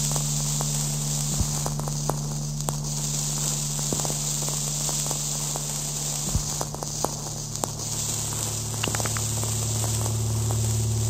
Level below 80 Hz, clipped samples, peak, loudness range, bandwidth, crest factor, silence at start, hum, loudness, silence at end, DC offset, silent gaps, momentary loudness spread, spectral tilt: -40 dBFS; under 0.1%; -4 dBFS; 2 LU; 16 kHz; 24 dB; 0 s; none; -26 LUFS; 0 s; under 0.1%; none; 4 LU; -3.5 dB/octave